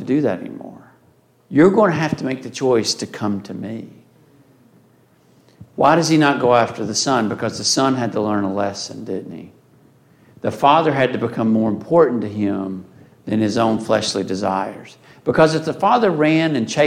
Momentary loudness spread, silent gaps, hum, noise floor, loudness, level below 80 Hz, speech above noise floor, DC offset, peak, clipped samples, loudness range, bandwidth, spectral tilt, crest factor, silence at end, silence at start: 15 LU; none; none; -55 dBFS; -18 LUFS; -58 dBFS; 38 dB; under 0.1%; -2 dBFS; under 0.1%; 5 LU; 14 kHz; -5 dB/octave; 18 dB; 0 s; 0 s